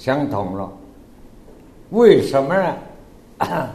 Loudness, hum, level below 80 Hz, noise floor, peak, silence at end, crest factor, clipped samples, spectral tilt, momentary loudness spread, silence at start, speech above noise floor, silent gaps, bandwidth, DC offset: -18 LUFS; none; -48 dBFS; -43 dBFS; 0 dBFS; 0 s; 20 dB; under 0.1%; -7 dB/octave; 17 LU; 0 s; 26 dB; none; 13.5 kHz; under 0.1%